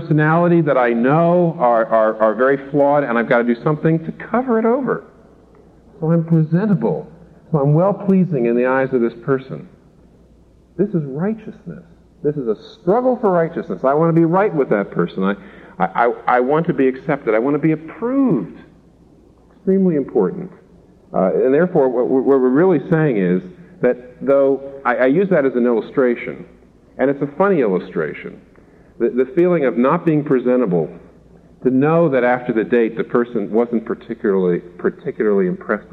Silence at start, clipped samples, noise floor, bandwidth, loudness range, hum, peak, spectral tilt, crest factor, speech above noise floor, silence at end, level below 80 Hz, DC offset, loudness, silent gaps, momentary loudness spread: 0 s; under 0.1%; -49 dBFS; 4.6 kHz; 4 LU; none; -2 dBFS; -10.5 dB/octave; 14 dB; 33 dB; 0.1 s; -56 dBFS; under 0.1%; -17 LUFS; none; 9 LU